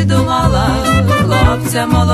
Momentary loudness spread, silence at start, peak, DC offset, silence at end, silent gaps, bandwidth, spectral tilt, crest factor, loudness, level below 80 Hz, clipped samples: 2 LU; 0 s; 0 dBFS; under 0.1%; 0 s; none; 13.5 kHz; -6 dB/octave; 12 dB; -12 LUFS; -22 dBFS; under 0.1%